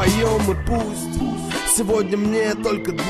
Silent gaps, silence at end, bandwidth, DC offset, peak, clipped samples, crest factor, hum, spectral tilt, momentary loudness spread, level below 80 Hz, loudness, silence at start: none; 0 s; 14.5 kHz; under 0.1%; -4 dBFS; under 0.1%; 16 dB; none; -4.5 dB/octave; 7 LU; -32 dBFS; -20 LUFS; 0 s